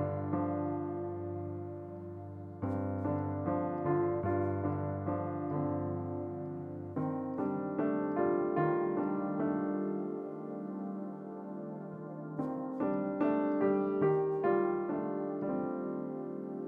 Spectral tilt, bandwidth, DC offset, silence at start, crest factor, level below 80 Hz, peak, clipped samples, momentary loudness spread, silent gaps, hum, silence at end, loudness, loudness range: -11.5 dB/octave; 3.8 kHz; under 0.1%; 0 s; 16 dB; -70 dBFS; -18 dBFS; under 0.1%; 12 LU; none; 50 Hz at -70 dBFS; 0 s; -35 LUFS; 5 LU